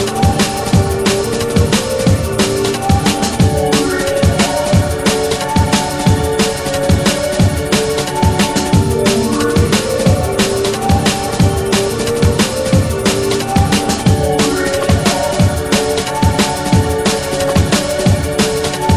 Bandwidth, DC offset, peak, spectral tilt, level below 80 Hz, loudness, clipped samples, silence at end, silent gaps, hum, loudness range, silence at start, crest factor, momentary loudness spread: over 20 kHz; under 0.1%; 0 dBFS; -5 dB/octave; -26 dBFS; -14 LUFS; under 0.1%; 0 s; none; none; 0 LU; 0 s; 14 dB; 2 LU